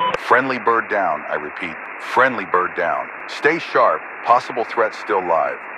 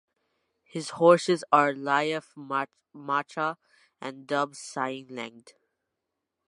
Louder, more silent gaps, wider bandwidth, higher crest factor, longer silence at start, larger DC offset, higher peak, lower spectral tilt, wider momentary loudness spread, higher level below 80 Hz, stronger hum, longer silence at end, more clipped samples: first, -19 LUFS vs -26 LUFS; neither; about the same, 12.5 kHz vs 11.5 kHz; about the same, 20 dB vs 24 dB; second, 0 s vs 0.75 s; neither; first, 0 dBFS vs -4 dBFS; about the same, -4.5 dB/octave vs -4.5 dB/octave; second, 9 LU vs 19 LU; first, -62 dBFS vs -82 dBFS; neither; second, 0 s vs 1.1 s; neither